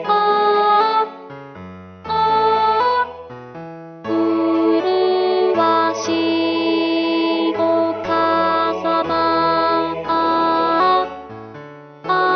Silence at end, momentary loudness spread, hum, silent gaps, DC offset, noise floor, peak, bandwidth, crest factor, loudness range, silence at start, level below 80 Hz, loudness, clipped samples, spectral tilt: 0 s; 19 LU; none; none; under 0.1%; -37 dBFS; -4 dBFS; 6.6 kHz; 14 dB; 2 LU; 0 s; -54 dBFS; -17 LUFS; under 0.1%; -5 dB/octave